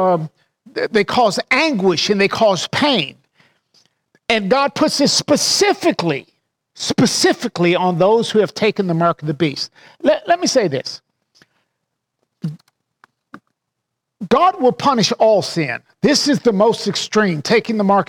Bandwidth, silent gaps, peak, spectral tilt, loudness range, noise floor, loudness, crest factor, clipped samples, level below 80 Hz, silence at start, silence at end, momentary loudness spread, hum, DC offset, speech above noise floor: 17.5 kHz; none; -2 dBFS; -4 dB/octave; 6 LU; -78 dBFS; -16 LUFS; 14 dB; under 0.1%; -58 dBFS; 0 s; 0.05 s; 11 LU; none; under 0.1%; 62 dB